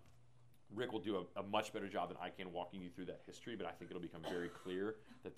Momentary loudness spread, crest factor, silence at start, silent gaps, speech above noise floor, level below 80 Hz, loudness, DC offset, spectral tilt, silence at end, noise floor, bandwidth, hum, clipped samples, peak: 10 LU; 24 dB; 0.05 s; none; 24 dB; -76 dBFS; -46 LUFS; under 0.1%; -5.5 dB/octave; 0 s; -70 dBFS; 14.5 kHz; none; under 0.1%; -24 dBFS